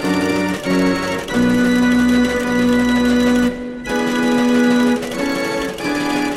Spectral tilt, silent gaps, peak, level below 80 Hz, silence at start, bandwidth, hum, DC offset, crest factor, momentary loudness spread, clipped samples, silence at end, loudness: -5 dB/octave; none; -4 dBFS; -40 dBFS; 0 s; 14 kHz; none; under 0.1%; 12 dB; 6 LU; under 0.1%; 0 s; -16 LUFS